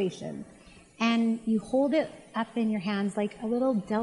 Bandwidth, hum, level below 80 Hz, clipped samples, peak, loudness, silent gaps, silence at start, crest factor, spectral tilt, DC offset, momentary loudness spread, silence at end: 11 kHz; none; -64 dBFS; under 0.1%; -12 dBFS; -28 LUFS; none; 0 s; 18 dB; -6.5 dB/octave; under 0.1%; 12 LU; 0 s